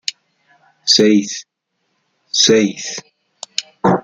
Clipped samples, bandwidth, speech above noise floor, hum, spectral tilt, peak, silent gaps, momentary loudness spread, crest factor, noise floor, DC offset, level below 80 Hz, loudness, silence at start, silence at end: under 0.1%; 10 kHz; 55 dB; none; -3 dB/octave; 0 dBFS; none; 17 LU; 18 dB; -69 dBFS; under 0.1%; -58 dBFS; -15 LUFS; 0.1 s; 0.05 s